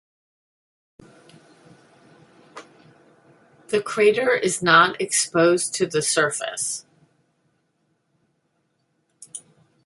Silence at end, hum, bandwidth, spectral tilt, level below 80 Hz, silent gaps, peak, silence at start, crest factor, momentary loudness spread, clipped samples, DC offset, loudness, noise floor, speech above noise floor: 0.45 s; none; 12 kHz; -2.5 dB/octave; -70 dBFS; none; -2 dBFS; 2.55 s; 22 dB; 19 LU; under 0.1%; under 0.1%; -20 LUFS; -70 dBFS; 50 dB